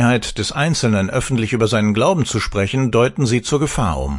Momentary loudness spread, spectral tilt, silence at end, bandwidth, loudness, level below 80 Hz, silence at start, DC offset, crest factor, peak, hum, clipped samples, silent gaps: 4 LU; -5.5 dB/octave; 0 s; 11.5 kHz; -17 LUFS; -34 dBFS; 0 s; under 0.1%; 16 dB; -2 dBFS; none; under 0.1%; none